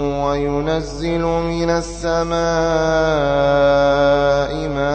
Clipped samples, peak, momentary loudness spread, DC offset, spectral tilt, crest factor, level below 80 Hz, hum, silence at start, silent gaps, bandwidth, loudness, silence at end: under 0.1%; -4 dBFS; 7 LU; under 0.1%; -5.5 dB/octave; 14 dB; -32 dBFS; none; 0 s; none; 8.8 kHz; -17 LUFS; 0 s